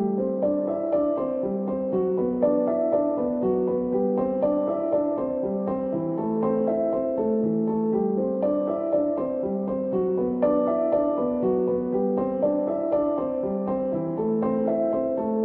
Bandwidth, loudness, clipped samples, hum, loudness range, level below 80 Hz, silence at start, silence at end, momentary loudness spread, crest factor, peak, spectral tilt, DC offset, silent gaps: 3.3 kHz; -25 LUFS; under 0.1%; none; 1 LU; -56 dBFS; 0 s; 0 s; 4 LU; 14 dB; -10 dBFS; -12.5 dB/octave; under 0.1%; none